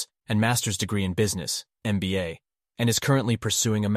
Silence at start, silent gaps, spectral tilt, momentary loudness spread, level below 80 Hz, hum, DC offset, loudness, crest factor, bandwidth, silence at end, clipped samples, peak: 0 s; none; -4.5 dB/octave; 7 LU; -54 dBFS; none; under 0.1%; -25 LUFS; 16 dB; 15.5 kHz; 0 s; under 0.1%; -10 dBFS